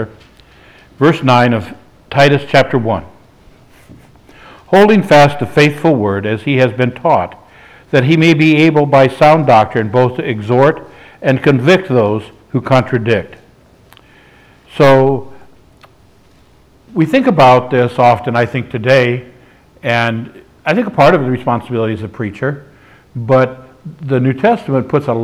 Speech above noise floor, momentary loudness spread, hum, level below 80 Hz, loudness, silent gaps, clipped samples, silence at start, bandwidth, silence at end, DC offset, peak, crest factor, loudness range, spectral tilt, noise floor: 36 dB; 13 LU; none; -48 dBFS; -12 LUFS; none; under 0.1%; 0 s; 13.5 kHz; 0 s; under 0.1%; 0 dBFS; 12 dB; 6 LU; -7 dB/octave; -47 dBFS